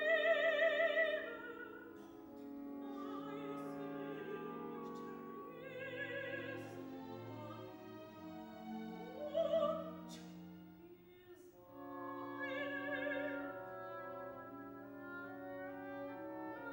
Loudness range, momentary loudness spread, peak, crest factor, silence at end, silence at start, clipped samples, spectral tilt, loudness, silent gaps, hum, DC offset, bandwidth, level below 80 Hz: 6 LU; 19 LU; -24 dBFS; 20 dB; 0 s; 0 s; under 0.1%; -5.5 dB/octave; -43 LUFS; none; none; under 0.1%; 16 kHz; -80 dBFS